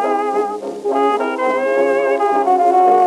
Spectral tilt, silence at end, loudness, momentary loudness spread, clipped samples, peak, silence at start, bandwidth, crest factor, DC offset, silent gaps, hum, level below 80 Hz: -4.5 dB/octave; 0 s; -16 LUFS; 8 LU; under 0.1%; -4 dBFS; 0 s; 12 kHz; 12 dB; under 0.1%; none; none; -70 dBFS